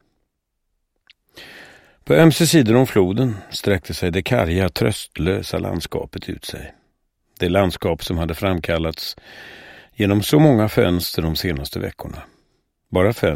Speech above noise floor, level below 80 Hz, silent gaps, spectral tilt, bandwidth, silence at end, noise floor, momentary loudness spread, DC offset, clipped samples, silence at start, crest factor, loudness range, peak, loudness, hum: 56 dB; -40 dBFS; none; -5.5 dB/octave; 16.5 kHz; 0 s; -74 dBFS; 21 LU; under 0.1%; under 0.1%; 1.35 s; 20 dB; 6 LU; 0 dBFS; -19 LUFS; none